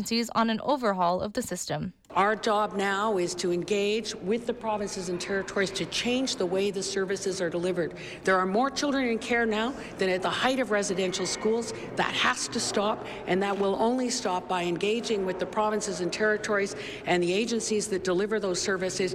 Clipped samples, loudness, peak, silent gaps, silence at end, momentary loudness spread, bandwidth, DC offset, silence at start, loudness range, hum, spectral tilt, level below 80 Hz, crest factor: under 0.1%; -28 LUFS; -14 dBFS; none; 0 s; 5 LU; 15.5 kHz; under 0.1%; 0 s; 2 LU; none; -3.5 dB/octave; -58 dBFS; 14 dB